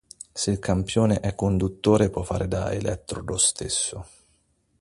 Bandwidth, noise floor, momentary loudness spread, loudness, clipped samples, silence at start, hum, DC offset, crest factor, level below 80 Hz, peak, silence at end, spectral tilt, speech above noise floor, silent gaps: 11.5 kHz; -67 dBFS; 9 LU; -24 LUFS; under 0.1%; 0.35 s; none; under 0.1%; 20 dB; -42 dBFS; -6 dBFS; 0.75 s; -4.5 dB/octave; 43 dB; none